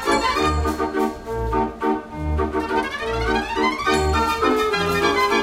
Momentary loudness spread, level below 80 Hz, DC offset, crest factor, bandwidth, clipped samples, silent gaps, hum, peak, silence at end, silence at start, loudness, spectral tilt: 5 LU; -32 dBFS; under 0.1%; 16 dB; 16 kHz; under 0.1%; none; none; -4 dBFS; 0 s; 0 s; -21 LUFS; -5 dB/octave